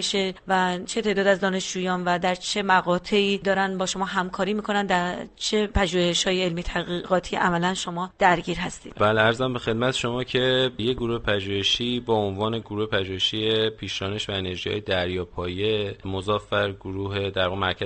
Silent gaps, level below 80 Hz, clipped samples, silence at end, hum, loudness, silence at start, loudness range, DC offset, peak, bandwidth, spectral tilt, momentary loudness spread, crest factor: none; -44 dBFS; under 0.1%; 0 s; none; -24 LUFS; 0 s; 3 LU; under 0.1%; -4 dBFS; 8.8 kHz; -4 dB/octave; 7 LU; 20 dB